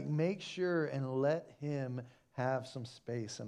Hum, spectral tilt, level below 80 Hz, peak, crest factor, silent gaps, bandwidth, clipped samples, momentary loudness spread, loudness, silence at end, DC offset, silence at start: none; -6.5 dB/octave; -80 dBFS; -22 dBFS; 16 dB; none; 10.5 kHz; under 0.1%; 12 LU; -38 LUFS; 0 s; under 0.1%; 0 s